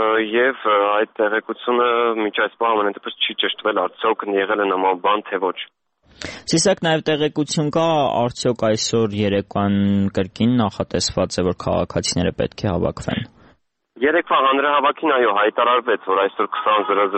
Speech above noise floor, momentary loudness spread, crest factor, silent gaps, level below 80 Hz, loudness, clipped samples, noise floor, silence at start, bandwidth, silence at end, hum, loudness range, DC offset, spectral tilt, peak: 38 dB; 6 LU; 14 dB; none; -48 dBFS; -19 LUFS; under 0.1%; -57 dBFS; 0 s; 8.8 kHz; 0 s; none; 3 LU; under 0.1%; -4.5 dB/octave; -6 dBFS